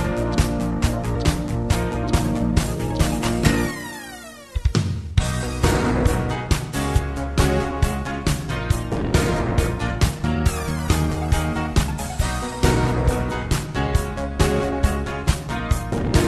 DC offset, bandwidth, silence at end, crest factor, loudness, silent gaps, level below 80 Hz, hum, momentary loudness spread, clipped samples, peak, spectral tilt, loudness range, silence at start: under 0.1%; 13 kHz; 0 s; 18 dB; -22 LUFS; none; -26 dBFS; none; 5 LU; under 0.1%; -2 dBFS; -5.5 dB/octave; 1 LU; 0 s